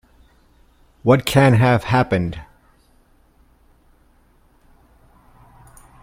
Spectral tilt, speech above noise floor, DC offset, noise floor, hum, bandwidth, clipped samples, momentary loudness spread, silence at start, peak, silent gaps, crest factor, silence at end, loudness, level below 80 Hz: -6.5 dB/octave; 40 dB; under 0.1%; -55 dBFS; none; 16 kHz; under 0.1%; 12 LU; 1.05 s; 0 dBFS; none; 22 dB; 3.6 s; -17 LUFS; -46 dBFS